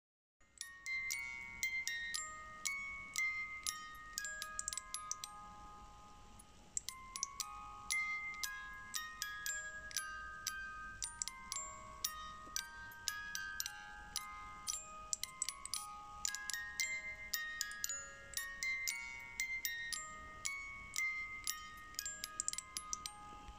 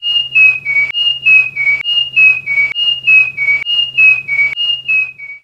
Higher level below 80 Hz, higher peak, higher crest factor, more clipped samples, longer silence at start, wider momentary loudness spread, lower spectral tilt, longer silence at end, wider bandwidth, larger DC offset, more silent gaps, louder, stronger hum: second, -66 dBFS vs -56 dBFS; second, -18 dBFS vs 0 dBFS; first, 28 dB vs 12 dB; neither; first, 0.4 s vs 0 s; first, 10 LU vs 5 LU; second, 1 dB/octave vs -0.5 dB/octave; about the same, 0 s vs 0.05 s; first, 16.5 kHz vs 9 kHz; neither; neither; second, -43 LUFS vs -9 LUFS; neither